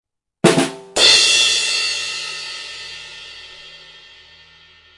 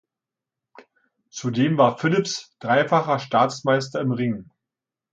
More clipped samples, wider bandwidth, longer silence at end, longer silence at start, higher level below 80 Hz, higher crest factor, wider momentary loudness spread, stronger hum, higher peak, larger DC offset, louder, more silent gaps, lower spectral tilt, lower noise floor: neither; first, 11.5 kHz vs 9.2 kHz; first, 1.2 s vs 0.7 s; second, 0.45 s vs 1.35 s; first, -56 dBFS vs -66 dBFS; about the same, 20 dB vs 20 dB; first, 24 LU vs 11 LU; neither; first, 0 dBFS vs -4 dBFS; neither; first, -14 LUFS vs -22 LUFS; neither; second, -1.5 dB/octave vs -5.5 dB/octave; second, -48 dBFS vs -88 dBFS